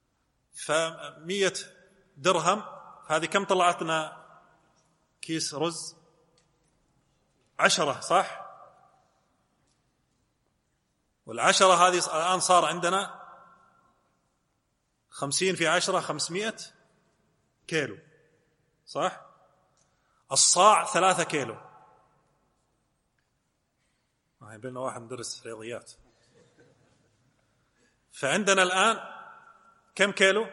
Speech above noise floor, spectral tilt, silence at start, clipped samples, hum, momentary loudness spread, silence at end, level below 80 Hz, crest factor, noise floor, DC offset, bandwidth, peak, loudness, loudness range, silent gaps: 50 dB; -2 dB/octave; 0.55 s; under 0.1%; none; 22 LU; 0 s; -78 dBFS; 24 dB; -76 dBFS; under 0.1%; 12 kHz; -4 dBFS; -25 LUFS; 16 LU; none